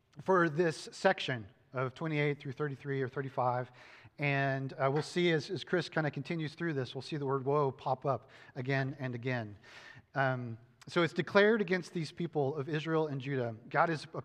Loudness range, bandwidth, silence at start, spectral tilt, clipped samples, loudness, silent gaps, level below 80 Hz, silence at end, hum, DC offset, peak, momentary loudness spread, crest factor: 4 LU; 10.5 kHz; 0.15 s; -6.5 dB/octave; under 0.1%; -34 LUFS; none; -78 dBFS; 0 s; none; under 0.1%; -12 dBFS; 10 LU; 22 dB